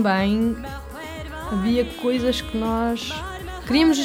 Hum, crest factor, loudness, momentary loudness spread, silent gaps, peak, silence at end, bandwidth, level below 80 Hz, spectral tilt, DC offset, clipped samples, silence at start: none; 16 dB; -23 LUFS; 14 LU; none; -6 dBFS; 0 s; over 20 kHz; -38 dBFS; -5 dB/octave; under 0.1%; under 0.1%; 0 s